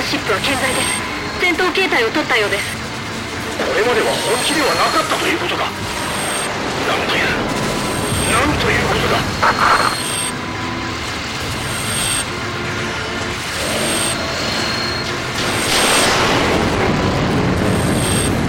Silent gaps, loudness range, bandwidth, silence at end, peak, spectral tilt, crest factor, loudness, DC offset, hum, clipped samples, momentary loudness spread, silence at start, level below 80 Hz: none; 4 LU; 16.5 kHz; 0 s; -2 dBFS; -3 dB/octave; 16 dB; -17 LUFS; under 0.1%; none; under 0.1%; 8 LU; 0 s; -36 dBFS